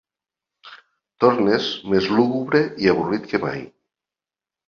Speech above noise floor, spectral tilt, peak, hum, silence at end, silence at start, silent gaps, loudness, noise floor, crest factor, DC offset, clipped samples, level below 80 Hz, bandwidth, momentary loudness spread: over 71 dB; -6.5 dB/octave; -2 dBFS; none; 1 s; 0.65 s; none; -20 LUFS; under -90 dBFS; 20 dB; under 0.1%; under 0.1%; -56 dBFS; 7 kHz; 7 LU